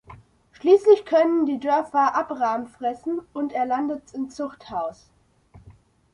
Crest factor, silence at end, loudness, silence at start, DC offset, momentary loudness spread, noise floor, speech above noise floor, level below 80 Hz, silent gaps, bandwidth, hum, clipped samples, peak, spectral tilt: 18 dB; 0.45 s; -23 LUFS; 0.1 s; under 0.1%; 14 LU; -53 dBFS; 31 dB; -62 dBFS; none; 10 kHz; none; under 0.1%; -6 dBFS; -5.5 dB/octave